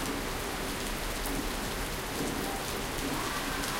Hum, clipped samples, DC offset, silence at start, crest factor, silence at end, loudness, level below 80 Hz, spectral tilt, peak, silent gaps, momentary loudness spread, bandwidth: none; under 0.1%; under 0.1%; 0 s; 16 dB; 0 s; -33 LUFS; -42 dBFS; -3 dB/octave; -18 dBFS; none; 2 LU; 17 kHz